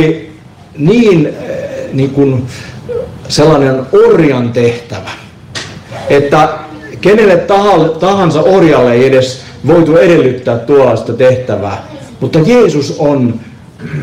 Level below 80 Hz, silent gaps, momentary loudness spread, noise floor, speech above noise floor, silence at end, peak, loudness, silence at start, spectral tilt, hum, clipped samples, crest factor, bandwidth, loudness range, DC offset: -40 dBFS; none; 16 LU; -33 dBFS; 25 dB; 0 s; 0 dBFS; -9 LUFS; 0 s; -6.5 dB/octave; none; under 0.1%; 8 dB; 12.5 kHz; 4 LU; under 0.1%